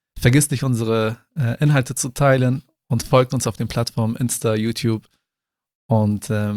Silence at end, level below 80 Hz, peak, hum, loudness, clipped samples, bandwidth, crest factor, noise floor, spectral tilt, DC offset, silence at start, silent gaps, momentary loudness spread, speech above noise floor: 0 s; -46 dBFS; -2 dBFS; none; -20 LUFS; under 0.1%; 15.5 kHz; 18 dB; -86 dBFS; -5.5 dB/octave; under 0.1%; 0.15 s; 5.75-5.89 s; 8 LU; 68 dB